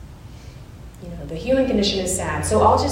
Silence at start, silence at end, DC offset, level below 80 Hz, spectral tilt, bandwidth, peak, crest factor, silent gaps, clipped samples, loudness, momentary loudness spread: 0 s; 0 s; under 0.1%; -38 dBFS; -4.5 dB/octave; 16 kHz; -4 dBFS; 18 dB; none; under 0.1%; -20 LUFS; 24 LU